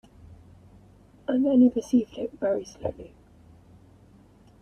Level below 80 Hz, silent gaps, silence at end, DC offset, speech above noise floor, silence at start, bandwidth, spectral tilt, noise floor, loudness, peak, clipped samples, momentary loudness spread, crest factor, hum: -58 dBFS; none; 1.55 s; under 0.1%; 30 dB; 0.3 s; 9 kHz; -7 dB/octave; -55 dBFS; -25 LUFS; -10 dBFS; under 0.1%; 15 LU; 18 dB; none